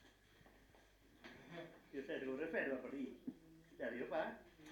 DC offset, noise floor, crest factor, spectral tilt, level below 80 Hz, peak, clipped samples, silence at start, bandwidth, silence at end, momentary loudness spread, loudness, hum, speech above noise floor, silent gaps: under 0.1%; -69 dBFS; 20 dB; -6 dB/octave; -76 dBFS; -28 dBFS; under 0.1%; 0 s; 19 kHz; 0 s; 25 LU; -47 LUFS; none; 24 dB; none